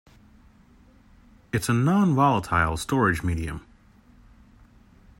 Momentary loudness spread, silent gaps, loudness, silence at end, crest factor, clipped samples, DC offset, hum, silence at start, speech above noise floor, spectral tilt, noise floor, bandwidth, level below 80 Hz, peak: 11 LU; none; -23 LUFS; 1.6 s; 20 dB; under 0.1%; under 0.1%; none; 1.55 s; 32 dB; -6 dB/octave; -55 dBFS; 16 kHz; -46 dBFS; -6 dBFS